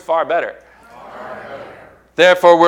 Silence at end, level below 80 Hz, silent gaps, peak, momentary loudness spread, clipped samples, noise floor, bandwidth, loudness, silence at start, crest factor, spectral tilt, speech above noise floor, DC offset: 0 s; -58 dBFS; none; 0 dBFS; 24 LU; 0.1%; -41 dBFS; 14 kHz; -13 LUFS; 0.1 s; 16 dB; -4 dB/octave; 29 dB; under 0.1%